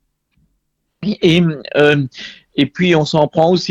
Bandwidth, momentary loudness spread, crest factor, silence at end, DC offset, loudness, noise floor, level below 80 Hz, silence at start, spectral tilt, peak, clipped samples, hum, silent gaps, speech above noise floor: 8.8 kHz; 12 LU; 16 dB; 0 s; under 0.1%; -15 LUFS; -68 dBFS; -50 dBFS; 1 s; -6.5 dB/octave; 0 dBFS; under 0.1%; none; none; 54 dB